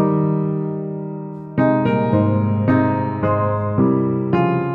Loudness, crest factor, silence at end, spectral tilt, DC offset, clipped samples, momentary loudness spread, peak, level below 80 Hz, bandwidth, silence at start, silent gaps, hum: -19 LUFS; 14 dB; 0 s; -11.5 dB/octave; under 0.1%; under 0.1%; 9 LU; -4 dBFS; -52 dBFS; 4.7 kHz; 0 s; none; none